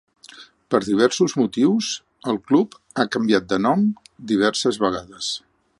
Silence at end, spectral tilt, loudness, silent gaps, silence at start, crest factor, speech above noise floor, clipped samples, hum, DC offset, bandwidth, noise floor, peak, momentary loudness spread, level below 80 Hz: 0.4 s; -4.5 dB/octave; -21 LUFS; none; 0.35 s; 18 dB; 26 dB; under 0.1%; none; under 0.1%; 11.5 kHz; -46 dBFS; -2 dBFS; 9 LU; -60 dBFS